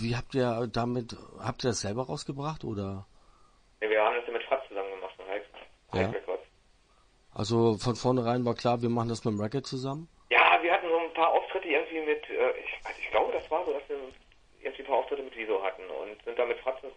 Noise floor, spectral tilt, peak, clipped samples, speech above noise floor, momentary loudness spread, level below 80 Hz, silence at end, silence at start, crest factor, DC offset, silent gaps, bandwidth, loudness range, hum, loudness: -64 dBFS; -5.5 dB/octave; -6 dBFS; under 0.1%; 33 dB; 13 LU; -58 dBFS; 0 s; 0 s; 24 dB; under 0.1%; none; 10.5 kHz; 7 LU; none; -30 LUFS